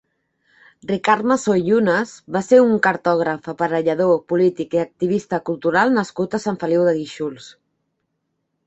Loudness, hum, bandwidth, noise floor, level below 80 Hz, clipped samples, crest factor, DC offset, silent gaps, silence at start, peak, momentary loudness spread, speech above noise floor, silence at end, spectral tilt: -19 LUFS; none; 8.2 kHz; -73 dBFS; -62 dBFS; under 0.1%; 18 dB; under 0.1%; none; 0.85 s; -2 dBFS; 9 LU; 55 dB; 1.15 s; -6 dB/octave